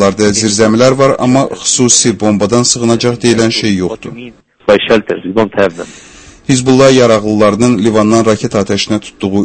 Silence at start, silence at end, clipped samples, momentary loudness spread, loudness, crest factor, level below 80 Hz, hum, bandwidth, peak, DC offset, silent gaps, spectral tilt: 0 s; 0 s; 0.8%; 9 LU; -10 LUFS; 10 dB; -42 dBFS; none; 11 kHz; 0 dBFS; under 0.1%; none; -4 dB/octave